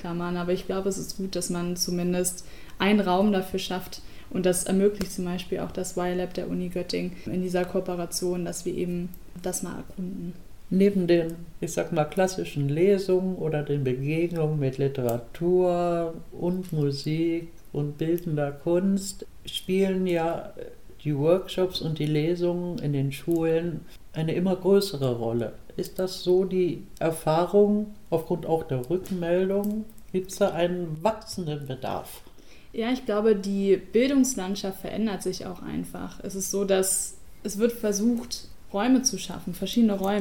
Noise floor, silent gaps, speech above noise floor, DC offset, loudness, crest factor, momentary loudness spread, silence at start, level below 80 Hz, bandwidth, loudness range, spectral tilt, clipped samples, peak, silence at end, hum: -49 dBFS; none; 23 dB; 0.6%; -27 LUFS; 18 dB; 12 LU; 0 s; -50 dBFS; 18 kHz; 4 LU; -5.5 dB/octave; under 0.1%; -10 dBFS; 0 s; none